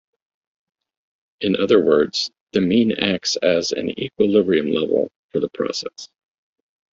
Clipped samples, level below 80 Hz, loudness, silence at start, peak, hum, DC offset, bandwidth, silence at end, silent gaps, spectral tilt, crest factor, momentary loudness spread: under 0.1%; -60 dBFS; -19 LUFS; 1.4 s; -2 dBFS; none; under 0.1%; 7.8 kHz; 0.85 s; 2.41-2.47 s, 5.16-5.29 s; -4.5 dB/octave; 18 dB; 9 LU